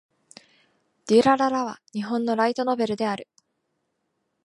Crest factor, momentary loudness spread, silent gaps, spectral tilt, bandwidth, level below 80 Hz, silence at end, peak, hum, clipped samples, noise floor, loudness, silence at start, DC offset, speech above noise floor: 20 dB; 14 LU; none; -5 dB/octave; 11.5 kHz; -70 dBFS; 1.2 s; -6 dBFS; none; under 0.1%; -76 dBFS; -23 LUFS; 1.05 s; under 0.1%; 53 dB